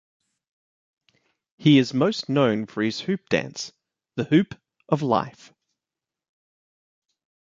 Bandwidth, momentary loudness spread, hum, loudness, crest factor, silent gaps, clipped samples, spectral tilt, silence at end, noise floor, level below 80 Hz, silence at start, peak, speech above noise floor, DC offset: 7.6 kHz; 16 LU; none; -23 LUFS; 22 dB; none; under 0.1%; -6 dB/octave; 2.15 s; -89 dBFS; -66 dBFS; 1.6 s; -4 dBFS; 67 dB; under 0.1%